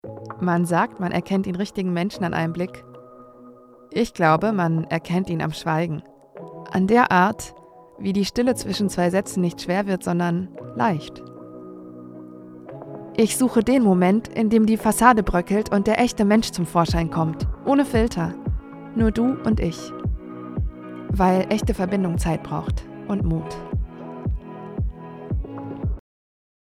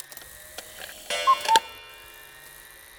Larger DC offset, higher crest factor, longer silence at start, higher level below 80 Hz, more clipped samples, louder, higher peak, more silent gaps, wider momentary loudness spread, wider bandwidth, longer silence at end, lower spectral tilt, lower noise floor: neither; about the same, 22 dB vs 26 dB; second, 0.05 s vs 0.2 s; first, -36 dBFS vs -62 dBFS; neither; about the same, -22 LUFS vs -22 LUFS; about the same, 0 dBFS vs -2 dBFS; neither; second, 18 LU vs 23 LU; second, 15.5 kHz vs over 20 kHz; first, 0.8 s vs 0.4 s; first, -6 dB/octave vs 0.5 dB/octave; about the same, -47 dBFS vs -47 dBFS